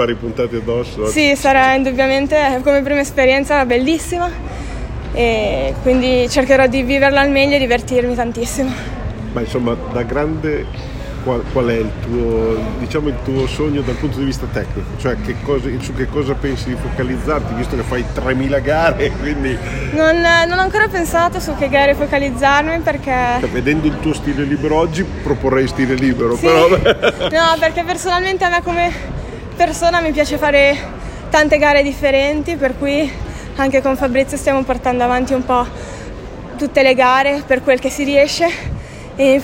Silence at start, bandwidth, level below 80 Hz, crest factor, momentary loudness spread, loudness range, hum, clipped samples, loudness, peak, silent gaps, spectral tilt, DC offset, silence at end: 0 s; 16.5 kHz; -28 dBFS; 14 dB; 11 LU; 6 LU; none; under 0.1%; -15 LUFS; 0 dBFS; none; -5 dB/octave; under 0.1%; 0 s